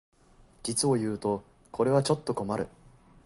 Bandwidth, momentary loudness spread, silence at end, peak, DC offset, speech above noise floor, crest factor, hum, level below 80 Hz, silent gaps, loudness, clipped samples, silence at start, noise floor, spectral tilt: 11.5 kHz; 12 LU; 0.6 s; -12 dBFS; under 0.1%; 31 dB; 18 dB; none; -60 dBFS; none; -29 LUFS; under 0.1%; 0.65 s; -58 dBFS; -5 dB/octave